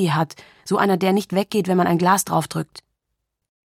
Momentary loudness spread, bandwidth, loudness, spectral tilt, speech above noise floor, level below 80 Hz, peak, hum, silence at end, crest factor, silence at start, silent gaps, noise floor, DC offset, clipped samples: 11 LU; 16 kHz; -20 LUFS; -5.5 dB/octave; 58 dB; -64 dBFS; -4 dBFS; none; 0.85 s; 18 dB; 0 s; none; -78 dBFS; under 0.1%; under 0.1%